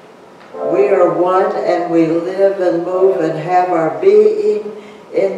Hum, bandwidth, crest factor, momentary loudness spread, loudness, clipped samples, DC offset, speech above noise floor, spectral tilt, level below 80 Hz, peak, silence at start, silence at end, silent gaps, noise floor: none; 8.4 kHz; 12 dB; 11 LU; -14 LUFS; under 0.1%; under 0.1%; 26 dB; -7.5 dB/octave; -70 dBFS; 0 dBFS; 0.4 s; 0 s; none; -39 dBFS